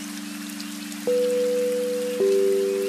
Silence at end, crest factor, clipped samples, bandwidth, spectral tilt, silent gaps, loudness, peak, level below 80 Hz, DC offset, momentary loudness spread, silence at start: 0 s; 12 dB; under 0.1%; 15.5 kHz; -4 dB/octave; none; -24 LUFS; -12 dBFS; -74 dBFS; under 0.1%; 12 LU; 0 s